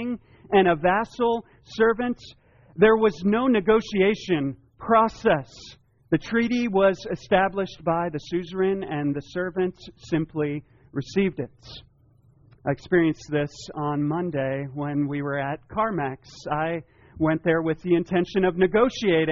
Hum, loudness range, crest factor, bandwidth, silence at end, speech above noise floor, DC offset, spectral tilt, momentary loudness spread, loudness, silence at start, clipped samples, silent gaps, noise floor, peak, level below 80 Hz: none; 6 LU; 18 dB; 7.2 kHz; 0 s; 35 dB; under 0.1%; -5 dB/octave; 13 LU; -24 LUFS; 0 s; under 0.1%; none; -58 dBFS; -6 dBFS; -52 dBFS